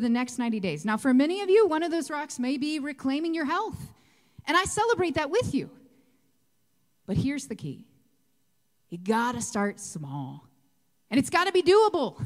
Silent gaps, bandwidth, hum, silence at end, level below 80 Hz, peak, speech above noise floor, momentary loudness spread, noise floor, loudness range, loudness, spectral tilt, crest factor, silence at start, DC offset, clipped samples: none; 15.5 kHz; none; 0 s; -58 dBFS; -8 dBFS; 48 dB; 16 LU; -74 dBFS; 7 LU; -26 LUFS; -4.5 dB/octave; 20 dB; 0 s; under 0.1%; under 0.1%